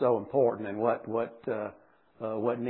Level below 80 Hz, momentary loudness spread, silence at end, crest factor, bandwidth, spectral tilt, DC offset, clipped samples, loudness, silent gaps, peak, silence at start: -76 dBFS; 9 LU; 0 s; 16 dB; 4 kHz; -7 dB/octave; under 0.1%; under 0.1%; -31 LUFS; none; -14 dBFS; 0 s